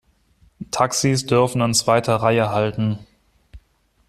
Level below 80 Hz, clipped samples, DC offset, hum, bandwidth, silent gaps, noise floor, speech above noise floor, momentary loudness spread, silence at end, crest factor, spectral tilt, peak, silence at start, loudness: -52 dBFS; under 0.1%; under 0.1%; none; 14 kHz; none; -61 dBFS; 42 dB; 9 LU; 0.5 s; 18 dB; -4.5 dB/octave; -4 dBFS; 0.6 s; -19 LUFS